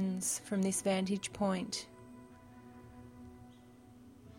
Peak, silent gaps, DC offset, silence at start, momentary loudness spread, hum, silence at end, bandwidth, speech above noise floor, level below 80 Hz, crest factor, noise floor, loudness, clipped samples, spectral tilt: -22 dBFS; none; under 0.1%; 0 s; 24 LU; none; 0 s; 16.5 kHz; 23 dB; -68 dBFS; 16 dB; -58 dBFS; -35 LUFS; under 0.1%; -4.5 dB/octave